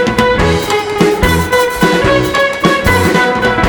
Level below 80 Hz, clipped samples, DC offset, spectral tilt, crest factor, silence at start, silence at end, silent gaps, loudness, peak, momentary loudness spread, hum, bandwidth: -26 dBFS; under 0.1%; under 0.1%; -5 dB/octave; 10 dB; 0 s; 0 s; none; -11 LUFS; 0 dBFS; 2 LU; none; over 20 kHz